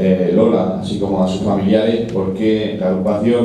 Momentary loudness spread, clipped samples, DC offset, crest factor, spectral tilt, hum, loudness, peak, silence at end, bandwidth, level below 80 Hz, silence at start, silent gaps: 6 LU; under 0.1%; under 0.1%; 14 dB; -8 dB/octave; none; -16 LUFS; -2 dBFS; 0 s; 9.6 kHz; -46 dBFS; 0 s; none